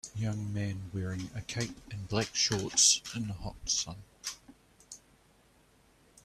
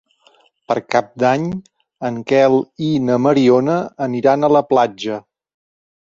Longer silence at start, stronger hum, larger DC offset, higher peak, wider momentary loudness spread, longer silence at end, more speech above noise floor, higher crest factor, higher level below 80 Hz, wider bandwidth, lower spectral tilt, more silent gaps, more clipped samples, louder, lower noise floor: second, 0.05 s vs 0.7 s; neither; neither; second, -10 dBFS vs 0 dBFS; first, 22 LU vs 12 LU; first, 1.25 s vs 0.95 s; second, 32 dB vs 39 dB; first, 24 dB vs 16 dB; about the same, -56 dBFS vs -58 dBFS; first, 14 kHz vs 7.6 kHz; second, -2.5 dB/octave vs -7 dB/octave; neither; neither; second, -31 LUFS vs -16 LUFS; first, -65 dBFS vs -55 dBFS